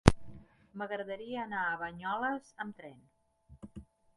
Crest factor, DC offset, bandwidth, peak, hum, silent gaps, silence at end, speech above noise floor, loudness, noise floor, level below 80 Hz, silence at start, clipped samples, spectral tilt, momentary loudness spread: 36 dB; under 0.1%; 11.5 kHz; 0 dBFS; none; none; 0.35 s; 20 dB; -36 LUFS; -58 dBFS; -46 dBFS; 0.05 s; under 0.1%; -6 dB/octave; 19 LU